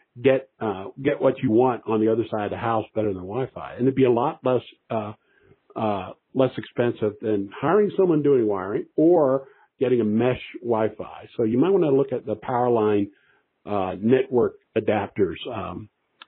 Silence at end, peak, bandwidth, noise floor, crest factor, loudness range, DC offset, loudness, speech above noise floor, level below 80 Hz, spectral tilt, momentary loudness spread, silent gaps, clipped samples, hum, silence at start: 0.4 s; -6 dBFS; 4.1 kHz; -57 dBFS; 18 dB; 4 LU; under 0.1%; -23 LUFS; 34 dB; -60 dBFS; -6.5 dB/octave; 10 LU; none; under 0.1%; none; 0.15 s